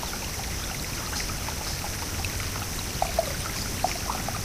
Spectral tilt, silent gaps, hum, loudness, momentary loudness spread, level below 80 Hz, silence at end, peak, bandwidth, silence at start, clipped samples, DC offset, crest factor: -3 dB/octave; none; none; -29 LUFS; 3 LU; -38 dBFS; 0 s; -10 dBFS; 16 kHz; 0 s; under 0.1%; under 0.1%; 20 dB